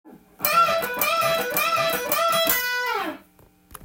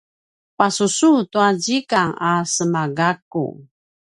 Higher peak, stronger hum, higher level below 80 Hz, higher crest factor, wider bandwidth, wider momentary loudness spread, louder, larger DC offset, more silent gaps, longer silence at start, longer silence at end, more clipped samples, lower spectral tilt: second, -4 dBFS vs 0 dBFS; neither; about the same, -58 dBFS vs -62 dBFS; about the same, 20 dB vs 18 dB; first, 17 kHz vs 11.5 kHz; about the same, 7 LU vs 8 LU; second, -21 LUFS vs -18 LUFS; neither; second, none vs 3.22-3.31 s; second, 0.05 s vs 0.6 s; second, 0 s vs 0.5 s; neither; second, -1.5 dB/octave vs -4 dB/octave